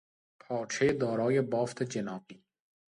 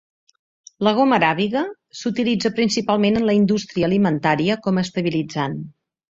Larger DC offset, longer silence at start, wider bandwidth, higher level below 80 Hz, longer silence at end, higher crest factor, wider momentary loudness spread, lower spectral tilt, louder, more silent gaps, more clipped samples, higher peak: neither; second, 0.5 s vs 0.8 s; first, 11.5 kHz vs 7.8 kHz; second, -66 dBFS vs -56 dBFS; first, 0.55 s vs 0.4 s; about the same, 18 dB vs 18 dB; about the same, 10 LU vs 9 LU; about the same, -5.5 dB/octave vs -5.5 dB/octave; second, -31 LUFS vs -20 LUFS; neither; neither; second, -16 dBFS vs -2 dBFS